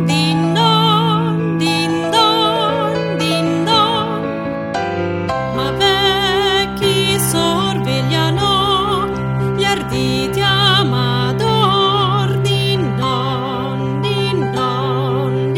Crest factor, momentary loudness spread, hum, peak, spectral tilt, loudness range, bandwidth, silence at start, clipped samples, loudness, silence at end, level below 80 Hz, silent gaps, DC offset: 14 dB; 7 LU; none; -2 dBFS; -5 dB/octave; 2 LU; 16.5 kHz; 0 s; under 0.1%; -15 LUFS; 0 s; -40 dBFS; none; under 0.1%